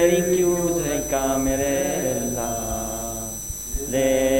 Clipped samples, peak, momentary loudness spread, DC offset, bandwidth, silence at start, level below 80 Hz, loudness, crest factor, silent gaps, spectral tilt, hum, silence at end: under 0.1%; -4 dBFS; 9 LU; under 0.1%; 16.5 kHz; 0 s; -38 dBFS; -23 LUFS; 18 dB; none; -4 dB/octave; 50 Hz at -40 dBFS; 0 s